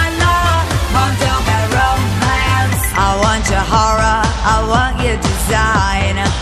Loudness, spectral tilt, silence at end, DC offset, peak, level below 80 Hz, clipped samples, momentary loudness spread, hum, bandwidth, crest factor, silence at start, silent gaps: -14 LUFS; -4.5 dB/octave; 0 s; under 0.1%; -2 dBFS; -20 dBFS; under 0.1%; 3 LU; none; 15.5 kHz; 12 dB; 0 s; none